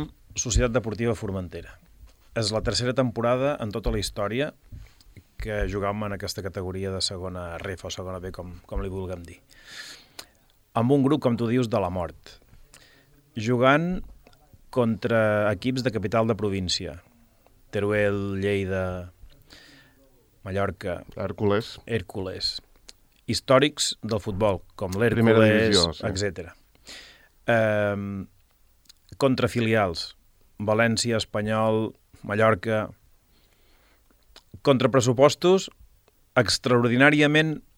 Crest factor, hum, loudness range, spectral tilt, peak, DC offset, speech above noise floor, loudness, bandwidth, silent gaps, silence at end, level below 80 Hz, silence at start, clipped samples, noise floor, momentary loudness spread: 22 dB; none; 8 LU; -5 dB/octave; -4 dBFS; under 0.1%; 36 dB; -24 LUFS; 16.5 kHz; none; 0.15 s; -44 dBFS; 0 s; under 0.1%; -60 dBFS; 18 LU